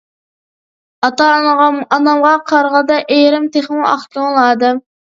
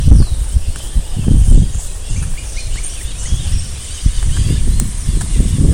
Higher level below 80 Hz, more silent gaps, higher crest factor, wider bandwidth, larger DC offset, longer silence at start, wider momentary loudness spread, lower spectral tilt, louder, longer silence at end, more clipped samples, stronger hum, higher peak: second, -64 dBFS vs -14 dBFS; neither; about the same, 12 dB vs 12 dB; second, 7.6 kHz vs 15.5 kHz; neither; first, 1 s vs 0 s; second, 5 LU vs 12 LU; second, -3.5 dB/octave vs -5.5 dB/octave; first, -12 LUFS vs -18 LUFS; first, 0.25 s vs 0 s; second, under 0.1% vs 0.9%; neither; about the same, 0 dBFS vs 0 dBFS